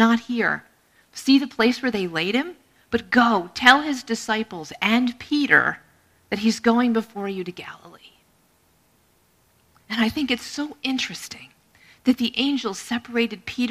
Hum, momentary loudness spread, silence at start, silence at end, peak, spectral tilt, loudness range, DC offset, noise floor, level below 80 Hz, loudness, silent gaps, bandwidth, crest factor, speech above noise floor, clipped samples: none; 14 LU; 0 s; 0 s; 0 dBFS; -4 dB/octave; 9 LU; under 0.1%; -62 dBFS; -60 dBFS; -22 LUFS; none; 15 kHz; 24 dB; 40 dB; under 0.1%